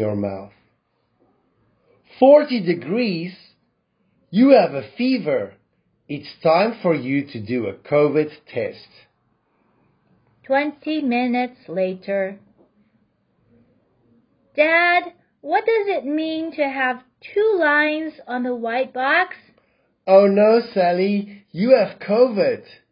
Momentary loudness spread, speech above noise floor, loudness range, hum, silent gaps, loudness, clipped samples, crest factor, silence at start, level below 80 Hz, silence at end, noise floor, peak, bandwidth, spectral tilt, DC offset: 14 LU; 49 dB; 7 LU; none; none; -19 LUFS; under 0.1%; 20 dB; 0 s; -66 dBFS; 0.3 s; -68 dBFS; 0 dBFS; 5.4 kHz; -10.5 dB/octave; under 0.1%